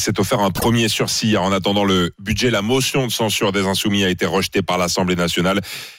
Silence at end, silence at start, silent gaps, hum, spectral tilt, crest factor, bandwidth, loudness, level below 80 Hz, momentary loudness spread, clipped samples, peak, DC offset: 0.05 s; 0 s; none; none; -4 dB/octave; 10 dB; 16 kHz; -18 LUFS; -44 dBFS; 2 LU; under 0.1%; -8 dBFS; under 0.1%